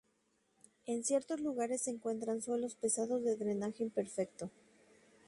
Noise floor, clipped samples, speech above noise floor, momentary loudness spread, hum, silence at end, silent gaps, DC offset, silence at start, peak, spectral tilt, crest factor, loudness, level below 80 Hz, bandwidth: -77 dBFS; under 0.1%; 40 dB; 7 LU; none; 0.75 s; none; under 0.1%; 0.85 s; -22 dBFS; -4.5 dB/octave; 16 dB; -37 LUFS; -80 dBFS; 11.5 kHz